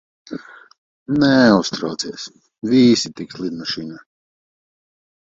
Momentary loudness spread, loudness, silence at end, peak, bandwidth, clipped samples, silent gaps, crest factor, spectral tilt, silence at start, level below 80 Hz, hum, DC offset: 21 LU; -17 LUFS; 1.3 s; 0 dBFS; 7.8 kHz; under 0.1%; 0.78-1.06 s; 20 dB; -5 dB/octave; 0.3 s; -56 dBFS; none; under 0.1%